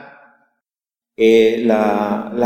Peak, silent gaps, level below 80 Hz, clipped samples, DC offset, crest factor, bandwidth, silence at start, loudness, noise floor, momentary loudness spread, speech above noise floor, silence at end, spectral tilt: -2 dBFS; none; -62 dBFS; under 0.1%; under 0.1%; 16 dB; 16 kHz; 0 s; -15 LUFS; under -90 dBFS; 7 LU; over 76 dB; 0 s; -6 dB/octave